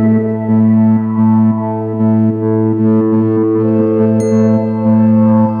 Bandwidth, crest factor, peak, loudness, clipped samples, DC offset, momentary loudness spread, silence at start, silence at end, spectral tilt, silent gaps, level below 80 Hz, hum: 9 kHz; 10 dB; 0 dBFS; -12 LUFS; under 0.1%; under 0.1%; 4 LU; 0 s; 0 s; -10.5 dB/octave; none; -56 dBFS; none